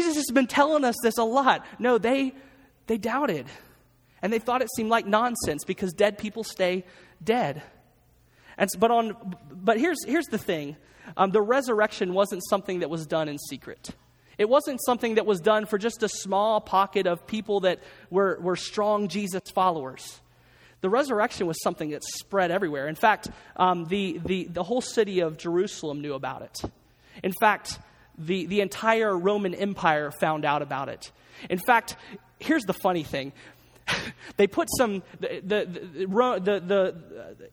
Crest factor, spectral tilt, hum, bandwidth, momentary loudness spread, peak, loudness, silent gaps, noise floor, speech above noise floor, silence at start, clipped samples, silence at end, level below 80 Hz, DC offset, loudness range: 22 dB; -4.5 dB/octave; none; over 20 kHz; 14 LU; -4 dBFS; -26 LUFS; none; -61 dBFS; 35 dB; 0 s; under 0.1%; 0.05 s; -60 dBFS; under 0.1%; 3 LU